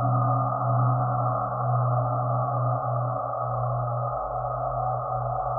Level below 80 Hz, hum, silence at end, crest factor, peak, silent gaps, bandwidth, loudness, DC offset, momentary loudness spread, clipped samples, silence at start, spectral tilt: -48 dBFS; none; 0 s; 12 dB; -12 dBFS; none; 1.6 kHz; -26 LUFS; under 0.1%; 5 LU; under 0.1%; 0 s; -15 dB/octave